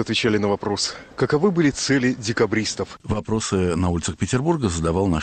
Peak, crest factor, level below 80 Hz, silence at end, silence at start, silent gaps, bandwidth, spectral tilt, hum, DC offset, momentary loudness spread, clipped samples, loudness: -8 dBFS; 14 dB; -42 dBFS; 0 s; 0 s; none; 9.4 kHz; -5 dB/octave; none; under 0.1%; 7 LU; under 0.1%; -22 LUFS